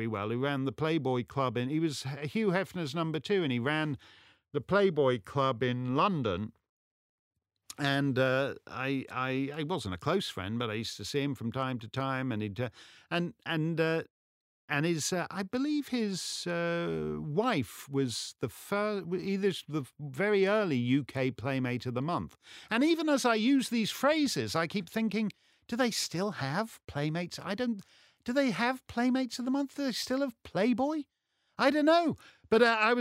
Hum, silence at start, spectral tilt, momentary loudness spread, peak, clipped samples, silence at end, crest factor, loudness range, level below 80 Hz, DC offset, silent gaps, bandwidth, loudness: none; 0 s; -5 dB/octave; 9 LU; -12 dBFS; under 0.1%; 0 s; 20 dB; 4 LU; -68 dBFS; under 0.1%; 6.69-7.31 s, 14.10-14.68 s; 16 kHz; -31 LUFS